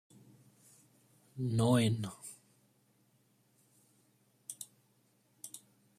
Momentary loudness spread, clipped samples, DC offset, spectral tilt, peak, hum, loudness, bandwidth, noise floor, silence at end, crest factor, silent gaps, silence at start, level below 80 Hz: 23 LU; under 0.1%; under 0.1%; -6 dB/octave; -18 dBFS; none; -33 LUFS; 15 kHz; -72 dBFS; 0.4 s; 22 dB; none; 1.35 s; -72 dBFS